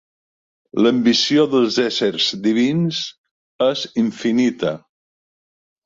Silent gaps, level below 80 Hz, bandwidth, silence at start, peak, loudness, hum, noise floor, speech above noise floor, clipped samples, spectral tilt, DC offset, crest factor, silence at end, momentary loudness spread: 3.18-3.24 s, 3.31-3.59 s; -62 dBFS; 7.6 kHz; 0.75 s; -4 dBFS; -18 LUFS; none; under -90 dBFS; over 73 dB; under 0.1%; -5 dB/octave; under 0.1%; 16 dB; 1.05 s; 10 LU